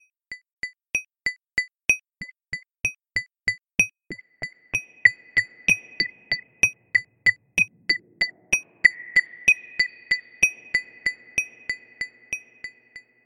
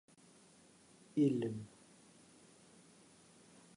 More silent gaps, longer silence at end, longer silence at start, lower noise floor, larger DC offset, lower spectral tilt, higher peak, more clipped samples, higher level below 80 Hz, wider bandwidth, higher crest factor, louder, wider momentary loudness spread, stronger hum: first, 0.53-0.57 s vs none; second, 0.25 s vs 2.1 s; second, 0.3 s vs 1.15 s; second, -49 dBFS vs -65 dBFS; neither; second, -0.5 dB/octave vs -7.5 dB/octave; first, -2 dBFS vs -22 dBFS; neither; first, -58 dBFS vs -82 dBFS; first, 13 kHz vs 11 kHz; about the same, 26 dB vs 22 dB; first, -23 LUFS vs -37 LUFS; second, 16 LU vs 28 LU; neither